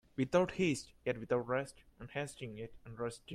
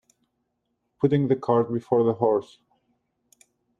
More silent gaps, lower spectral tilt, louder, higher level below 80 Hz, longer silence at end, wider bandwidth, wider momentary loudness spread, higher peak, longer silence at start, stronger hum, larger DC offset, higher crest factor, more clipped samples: neither; second, -5.5 dB/octave vs -9.5 dB/octave; second, -37 LUFS vs -23 LUFS; about the same, -64 dBFS vs -66 dBFS; second, 0 s vs 1.4 s; first, 14 kHz vs 10.5 kHz; first, 16 LU vs 3 LU; second, -16 dBFS vs -6 dBFS; second, 0.15 s vs 1 s; neither; neither; about the same, 22 dB vs 20 dB; neither